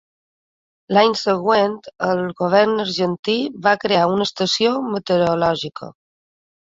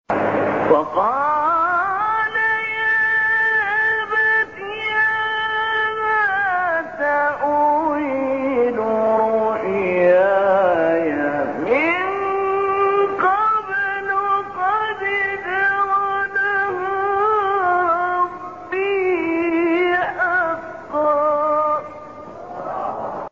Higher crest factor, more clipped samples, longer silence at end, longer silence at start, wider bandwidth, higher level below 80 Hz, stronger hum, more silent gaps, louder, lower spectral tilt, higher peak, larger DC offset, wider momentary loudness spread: about the same, 18 dB vs 16 dB; neither; first, 0.75 s vs 0.05 s; first, 0.9 s vs 0.1 s; about the same, 7.8 kHz vs 7.4 kHz; about the same, -60 dBFS vs -58 dBFS; neither; first, 3.19-3.23 s vs none; about the same, -18 LUFS vs -18 LUFS; about the same, -5 dB/octave vs -6 dB/octave; about the same, -2 dBFS vs -2 dBFS; second, under 0.1% vs 0.2%; about the same, 7 LU vs 6 LU